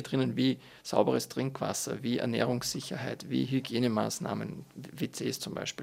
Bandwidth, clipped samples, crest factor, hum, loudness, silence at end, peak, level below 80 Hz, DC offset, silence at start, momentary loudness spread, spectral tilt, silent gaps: 16 kHz; under 0.1%; 22 dB; none; -32 LUFS; 0 s; -10 dBFS; -68 dBFS; under 0.1%; 0 s; 9 LU; -5 dB/octave; none